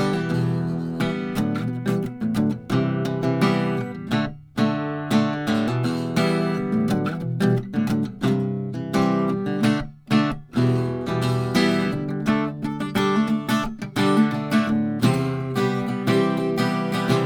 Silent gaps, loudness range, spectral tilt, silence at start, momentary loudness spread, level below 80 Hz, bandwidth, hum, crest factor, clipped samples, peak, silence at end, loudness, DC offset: none; 2 LU; -7 dB/octave; 0 s; 5 LU; -50 dBFS; 19 kHz; none; 16 dB; under 0.1%; -6 dBFS; 0 s; -23 LUFS; under 0.1%